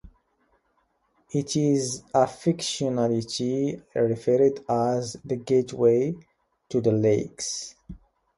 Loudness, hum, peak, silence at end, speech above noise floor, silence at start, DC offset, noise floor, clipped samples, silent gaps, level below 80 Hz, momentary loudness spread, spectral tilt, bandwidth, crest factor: -25 LUFS; none; -8 dBFS; 0.4 s; 46 dB; 0.05 s; under 0.1%; -70 dBFS; under 0.1%; none; -58 dBFS; 9 LU; -5.5 dB/octave; 11.5 kHz; 18 dB